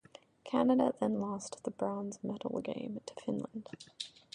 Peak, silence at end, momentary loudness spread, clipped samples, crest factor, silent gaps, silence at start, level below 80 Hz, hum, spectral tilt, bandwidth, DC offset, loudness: -16 dBFS; 0.25 s; 15 LU; under 0.1%; 20 dB; none; 0.45 s; -74 dBFS; none; -6 dB/octave; 10.5 kHz; under 0.1%; -36 LUFS